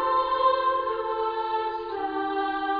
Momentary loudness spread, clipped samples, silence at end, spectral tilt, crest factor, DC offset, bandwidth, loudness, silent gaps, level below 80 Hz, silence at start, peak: 7 LU; under 0.1%; 0 s; -6 dB/octave; 16 dB; under 0.1%; 5.2 kHz; -26 LUFS; none; -58 dBFS; 0 s; -10 dBFS